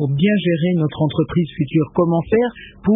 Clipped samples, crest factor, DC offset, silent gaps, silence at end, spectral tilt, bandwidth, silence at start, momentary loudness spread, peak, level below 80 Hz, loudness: under 0.1%; 14 dB; under 0.1%; none; 0 s; -13 dB/octave; 3.8 kHz; 0 s; 4 LU; -4 dBFS; -46 dBFS; -18 LUFS